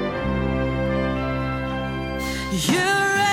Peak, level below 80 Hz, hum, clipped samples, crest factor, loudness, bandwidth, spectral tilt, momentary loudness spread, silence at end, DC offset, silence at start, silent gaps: -6 dBFS; -34 dBFS; none; under 0.1%; 16 dB; -23 LUFS; 17 kHz; -4.5 dB/octave; 8 LU; 0 s; under 0.1%; 0 s; none